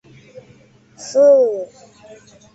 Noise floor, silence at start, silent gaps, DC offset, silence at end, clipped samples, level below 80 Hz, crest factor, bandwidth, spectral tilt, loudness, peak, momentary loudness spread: -49 dBFS; 1 s; none; under 0.1%; 0.9 s; under 0.1%; -66 dBFS; 16 dB; 8 kHz; -4.5 dB/octave; -14 LUFS; -4 dBFS; 23 LU